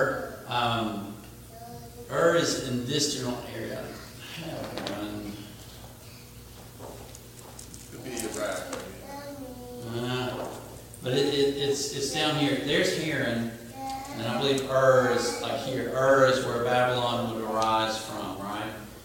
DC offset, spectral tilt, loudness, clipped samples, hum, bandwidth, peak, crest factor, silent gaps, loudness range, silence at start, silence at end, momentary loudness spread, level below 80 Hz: under 0.1%; -4 dB/octave; -28 LUFS; under 0.1%; 60 Hz at -50 dBFS; 17 kHz; -6 dBFS; 22 dB; none; 14 LU; 0 s; 0 s; 21 LU; -54 dBFS